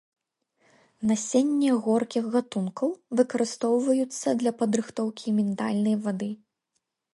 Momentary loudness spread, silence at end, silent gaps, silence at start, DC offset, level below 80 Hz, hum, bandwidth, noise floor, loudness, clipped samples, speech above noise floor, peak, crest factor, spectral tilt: 7 LU; 0.8 s; none; 1 s; under 0.1%; -72 dBFS; none; 11.5 kHz; -79 dBFS; -26 LUFS; under 0.1%; 54 dB; -8 dBFS; 18 dB; -5.5 dB/octave